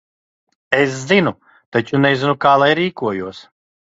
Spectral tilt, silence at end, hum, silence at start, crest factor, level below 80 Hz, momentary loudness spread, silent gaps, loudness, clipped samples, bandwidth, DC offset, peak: -5.5 dB/octave; 0.55 s; none; 0.7 s; 18 dB; -58 dBFS; 10 LU; 1.66-1.72 s; -16 LUFS; under 0.1%; 8 kHz; under 0.1%; 0 dBFS